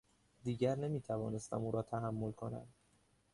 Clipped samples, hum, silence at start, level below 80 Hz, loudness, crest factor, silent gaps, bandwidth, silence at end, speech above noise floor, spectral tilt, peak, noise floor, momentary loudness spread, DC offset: under 0.1%; none; 0.45 s; -68 dBFS; -40 LUFS; 18 dB; none; 11.5 kHz; 0.65 s; 34 dB; -7.5 dB/octave; -22 dBFS; -73 dBFS; 10 LU; under 0.1%